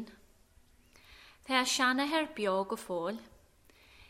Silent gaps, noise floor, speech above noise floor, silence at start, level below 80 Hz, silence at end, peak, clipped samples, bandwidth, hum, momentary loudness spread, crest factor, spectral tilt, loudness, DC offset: none; -63 dBFS; 31 dB; 0 s; -66 dBFS; 0.05 s; -14 dBFS; under 0.1%; 16 kHz; none; 17 LU; 22 dB; -2.5 dB/octave; -31 LUFS; under 0.1%